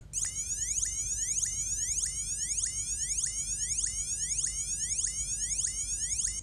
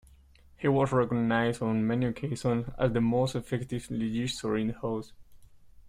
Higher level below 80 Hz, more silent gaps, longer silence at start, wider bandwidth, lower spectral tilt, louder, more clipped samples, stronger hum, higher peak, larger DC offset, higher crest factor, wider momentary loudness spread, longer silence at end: about the same, -48 dBFS vs -52 dBFS; neither; second, 0 s vs 0.6 s; first, 16 kHz vs 14 kHz; second, 0.5 dB/octave vs -6.5 dB/octave; about the same, -30 LUFS vs -29 LUFS; neither; neither; second, -18 dBFS vs -12 dBFS; neither; about the same, 16 dB vs 16 dB; second, 2 LU vs 8 LU; about the same, 0 s vs 0 s